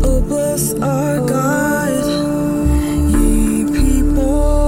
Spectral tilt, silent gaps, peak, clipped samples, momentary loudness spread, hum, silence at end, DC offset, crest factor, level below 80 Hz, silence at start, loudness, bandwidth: -6 dB/octave; none; -2 dBFS; under 0.1%; 2 LU; none; 0 s; under 0.1%; 12 dB; -18 dBFS; 0 s; -16 LUFS; 16.5 kHz